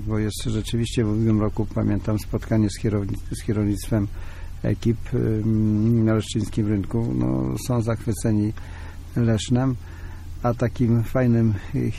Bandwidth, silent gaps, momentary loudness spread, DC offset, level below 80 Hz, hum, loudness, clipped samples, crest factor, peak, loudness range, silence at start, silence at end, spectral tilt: 14 kHz; none; 10 LU; under 0.1%; -36 dBFS; none; -23 LUFS; under 0.1%; 14 dB; -10 dBFS; 2 LU; 0 s; 0 s; -7 dB/octave